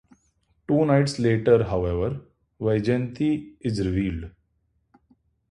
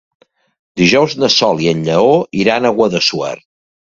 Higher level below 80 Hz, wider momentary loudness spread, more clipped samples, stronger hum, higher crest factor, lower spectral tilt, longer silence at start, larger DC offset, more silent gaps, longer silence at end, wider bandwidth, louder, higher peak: first, -44 dBFS vs -50 dBFS; about the same, 11 LU vs 11 LU; neither; neither; first, 20 dB vs 14 dB; first, -7.5 dB/octave vs -4.5 dB/octave; about the same, 0.7 s vs 0.75 s; neither; neither; first, 1.2 s vs 0.6 s; first, 11.5 kHz vs 7.8 kHz; second, -24 LUFS vs -13 LUFS; second, -6 dBFS vs 0 dBFS